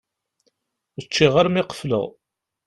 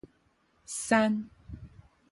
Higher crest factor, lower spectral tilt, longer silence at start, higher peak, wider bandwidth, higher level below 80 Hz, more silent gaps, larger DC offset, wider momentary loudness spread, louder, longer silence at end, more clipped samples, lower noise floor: about the same, 20 dB vs 24 dB; first, -5.5 dB/octave vs -4 dB/octave; first, 1 s vs 0.7 s; first, -2 dBFS vs -10 dBFS; about the same, 12 kHz vs 11.5 kHz; about the same, -54 dBFS vs -56 dBFS; neither; neither; second, 20 LU vs 23 LU; first, -20 LUFS vs -29 LUFS; about the same, 0.55 s vs 0.45 s; neither; about the same, -71 dBFS vs -69 dBFS